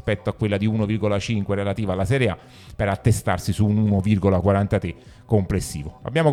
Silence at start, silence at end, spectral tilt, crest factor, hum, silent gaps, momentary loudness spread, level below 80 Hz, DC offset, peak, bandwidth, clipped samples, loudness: 0.05 s; 0 s; -7 dB/octave; 18 dB; none; none; 8 LU; -42 dBFS; under 0.1%; -4 dBFS; 14.5 kHz; under 0.1%; -22 LUFS